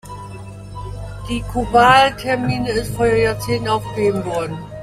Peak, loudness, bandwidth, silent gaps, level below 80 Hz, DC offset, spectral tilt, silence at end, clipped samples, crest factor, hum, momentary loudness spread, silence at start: -2 dBFS; -17 LUFS; 16 kHz; none; -36 dBFS; under 0.1%; -5.5 dB/octave; 0 s; under 0.1%; 18 dB; none; 21 LU; 0.05 s